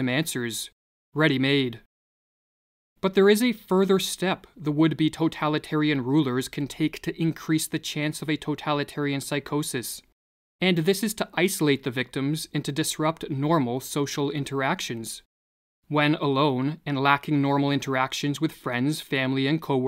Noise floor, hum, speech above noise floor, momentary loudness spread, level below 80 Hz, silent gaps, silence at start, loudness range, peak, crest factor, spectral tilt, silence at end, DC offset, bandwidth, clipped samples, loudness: under -90 dBFS; none; over 65 dB; 7 LU; -62 dBFS; 0.72-1.13 s, 1.86-2.96 s, 10.12-10.59 s, 15.25-15.82 s; 0 s; 4 LU; -4 dBFS; 22 dB; -5 dB/octave; 0 s; under 0.1%; 16 kHz; under 0.1%; -25 LUFS